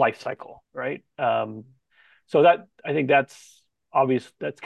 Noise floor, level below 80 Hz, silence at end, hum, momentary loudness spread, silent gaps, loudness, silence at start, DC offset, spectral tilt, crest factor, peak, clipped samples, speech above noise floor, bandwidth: -60 dBFS; -74 dBFS; 0 s; none; 16 LU; none; -24 LUFS; 0 s; under 0.1%; -6.5 dB/octave; 18 dB; -6 dBFS; under 0.1%; 37 dB; 11.5 kHz